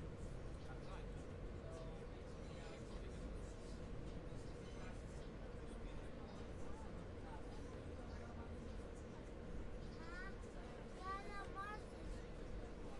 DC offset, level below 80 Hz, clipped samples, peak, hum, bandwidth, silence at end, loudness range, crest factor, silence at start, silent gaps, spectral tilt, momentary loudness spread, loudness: under 0.1%; -54 dBFS; under 0.1%; -36 dBFS; none; 11.5 kHz; 0 s; 2 LU; 14 dB; 0 s; none; -6.5 dB/octave; 4 LU; -53 LUFS